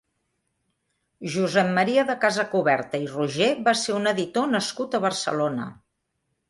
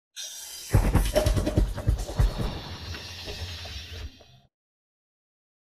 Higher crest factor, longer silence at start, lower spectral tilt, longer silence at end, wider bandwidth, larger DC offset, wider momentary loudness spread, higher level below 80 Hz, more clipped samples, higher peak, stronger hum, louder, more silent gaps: about the same, 18 dB vs 22 dB; first, 1.2 s vs 0.15 s; about the same, -4.5 dB/octave vs -5.5 dB/octave; second, 0.75 s vs 1.6 s; second, 11.5 kHz vs 15 kHz; neither; second, 7 LU vs 13 LU; second, -68 dBFS vs -32 dBFS; neither; about the same, -6 dBFS vs -6 dBFS; neither; first, -23 LUFS vs -29 LUFS; neither